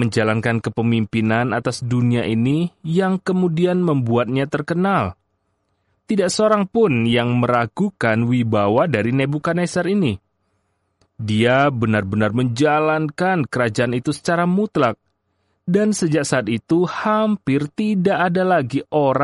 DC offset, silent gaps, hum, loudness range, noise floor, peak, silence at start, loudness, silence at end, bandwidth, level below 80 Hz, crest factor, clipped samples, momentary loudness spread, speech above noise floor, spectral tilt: under 0.1%; none; none; 2 LU; -69 dBFS; -4 dBFS; 0 s; -19 LUFS; 0 s; 11.5 kHz; -54 dBFS; 14 dB; under 0.1%; 5 LU; 51 dB; -6.5 dB/octave